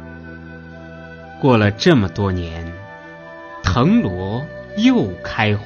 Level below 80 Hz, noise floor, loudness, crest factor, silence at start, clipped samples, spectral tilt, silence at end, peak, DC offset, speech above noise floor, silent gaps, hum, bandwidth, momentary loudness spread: -40 dBFS; -36 dBFS; -17 LUFS; 18 dB; 0 s; under 0.1%; -6.5 dB/octave; 0 s; 0 dBFS; under 0.1%; 20 dB; none; none; 7 kHz; 21 LU